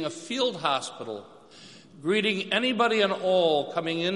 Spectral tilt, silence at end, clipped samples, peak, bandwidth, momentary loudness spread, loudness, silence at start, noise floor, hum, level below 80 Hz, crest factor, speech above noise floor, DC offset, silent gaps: -4 dB/octave; 0 s; under 0.1%; -8 dBFS; 11.5 kHz; 13 LU; -25 LUFS; 0 s; -50 dBFS; none; -76 dBFS; 18 dB; 24 dB; under 0.1%; none